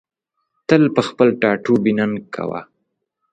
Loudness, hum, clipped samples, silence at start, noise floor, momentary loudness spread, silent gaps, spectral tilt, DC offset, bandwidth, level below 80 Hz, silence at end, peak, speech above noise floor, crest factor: -17 LUFS; none; under 0.1%; 0.7 s; -75 dBFS; 12 LU; none; -7 dB/octave; under 0.1%; 9 kHz; -58 dBFS; 0.7 s; 0 dBFS; 59 dB; 18 dB